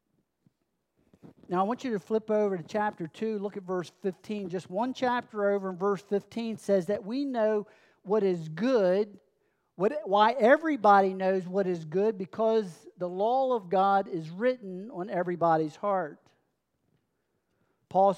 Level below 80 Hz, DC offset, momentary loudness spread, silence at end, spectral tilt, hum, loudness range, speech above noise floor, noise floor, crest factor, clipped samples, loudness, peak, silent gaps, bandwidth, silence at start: -82 dBFS; under 0.1%; 12 LU; 0 s; -7 dB/octave; none; 6 LU; 51 dB; -79 dBFS; 20 dB; under 0.1%; -28 LUFS; -8 dBFS; none; 11.5 kHz; 1.25 s